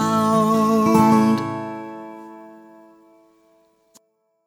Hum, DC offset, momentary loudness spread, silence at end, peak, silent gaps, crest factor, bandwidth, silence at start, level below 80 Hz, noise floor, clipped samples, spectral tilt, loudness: none; under 0.1%; 23 LU; 2 s; -2 dBFS; none; 18 dB; 16.5 kHz; 0 s; -62 dBFS; -60 dBFS; under 0.1%; -6.5 dB/octave; -17 LUFS